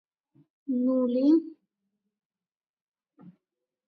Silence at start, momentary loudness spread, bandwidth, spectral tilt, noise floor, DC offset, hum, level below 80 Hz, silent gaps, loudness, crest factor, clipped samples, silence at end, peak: 0.7 s; 21 LU; 5.6 kHz; -8.5 dB/octave; under -90 dBFS; under 0.1%; none; -86 dBFS; 2.26-2.30 s, 2.69-2.92 s; -25 LUFS; 18 dB; under 0.1%; 0.55 s; -12 dBFS